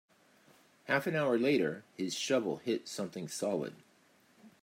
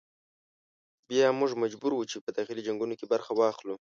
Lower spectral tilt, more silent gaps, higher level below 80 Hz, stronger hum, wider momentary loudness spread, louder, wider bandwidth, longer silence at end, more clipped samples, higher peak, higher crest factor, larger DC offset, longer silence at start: about the same, -4.5 dB/octave vs -4.5 dB/octave; second, none vs 2.21-2.27 s; about the same, -82 dBFS vs -80 dBFS; neither; about the same, 10 LU vs 9 LU; second, -34 LUFS vs -30 LUFS; first, 16 kHz vs 7.6 kHz; about the same, 0.15 s vs 0.2 s; neither; second, -16 dBFS vs -12 dBFS; about the same, 20 dB vs 20 dB; neither; second, 0.85 s vs 1.1 s